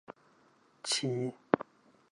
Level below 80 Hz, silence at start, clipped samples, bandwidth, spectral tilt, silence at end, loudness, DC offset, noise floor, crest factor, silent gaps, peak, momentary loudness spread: -76 dBFS; 0.1 s; under 0.1%; 11.5 kHz; -4 dB/octave; 0.5 s; -34 LUFS; under 0.1%; -66 dBFS; 30 dB; none; -6 dBFS; 21 LU